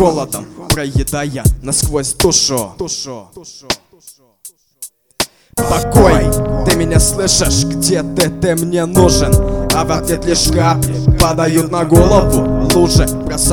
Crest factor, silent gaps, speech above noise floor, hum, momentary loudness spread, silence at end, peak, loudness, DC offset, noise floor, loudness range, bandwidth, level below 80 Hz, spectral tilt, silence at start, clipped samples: 14 dB; none; 31 dB; none; 11 LU; 0 s; 0 dBFS; -13 LUFS; under 0.1%; -43 dBFS; 6 LU; over 20 kHz; -22 dBFS; -4.5 dB/octave; 0 s; 0.2%